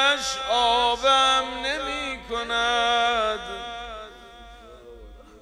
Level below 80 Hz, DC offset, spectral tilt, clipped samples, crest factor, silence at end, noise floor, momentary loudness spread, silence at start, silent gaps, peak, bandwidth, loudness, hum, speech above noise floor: -48 dBFS; under 0.1%; -1 dB/octave; under 0.1%; 18 dB; 0.05 s; -45 dBFS; 16 LU; 0 s; none; -8 dBFS; 13.5 kHz; -22 LUFS; none; 23 dB